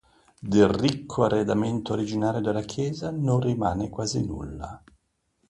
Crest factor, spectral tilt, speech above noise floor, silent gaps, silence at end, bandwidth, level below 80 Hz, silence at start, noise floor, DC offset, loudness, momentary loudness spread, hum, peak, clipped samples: 20 dB; -6.5 dB/octave; 47 dB; none; 0.7 s; 11.5 kHz; -48 dBFS; 0.4 s; -71 dBFS; under 0.1%; -25 LUFS; 13 LU; none; -6 dBFS; under 0.1%